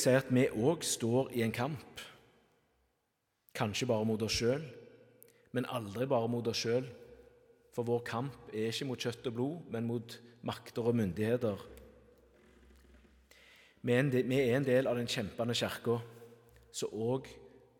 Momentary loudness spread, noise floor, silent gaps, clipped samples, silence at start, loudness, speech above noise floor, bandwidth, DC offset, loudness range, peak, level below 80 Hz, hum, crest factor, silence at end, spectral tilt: 15 LU; -81 dBFS; none; under 0.1%; 0 s; -34 LUFS; 48 dB; 17.5 kHz; under 0.1%; 5 LU; -14 dBFS; -66 dBFS; none; 20 dB; 0.35 s; -5 dB/octave